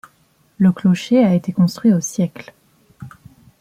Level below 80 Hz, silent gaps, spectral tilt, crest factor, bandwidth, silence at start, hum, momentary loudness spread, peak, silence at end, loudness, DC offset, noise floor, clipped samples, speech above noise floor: -58 dBFS; none; -7 dB/octave; 14 dB; 14.5 kHz; 0.6 s; none; 8 LU; -4 dBFS; 0.5 s; -17 LUFS; under 0.1%; -58 dBFS; under 0.1%; 42 dB